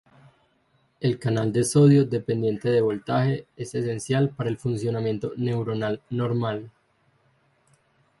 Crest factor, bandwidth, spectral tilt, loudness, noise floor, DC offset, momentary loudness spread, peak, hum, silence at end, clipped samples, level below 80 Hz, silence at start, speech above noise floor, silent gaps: 18 dB; 11.5 kHz; -7 dB/octave; -24 LUFS; -66 dBFS; under 0.1%; 10 LU; -6 dBFS; none; 1.5 s; under 0.1%; -60 dBFS; 1 s; 43 dB; none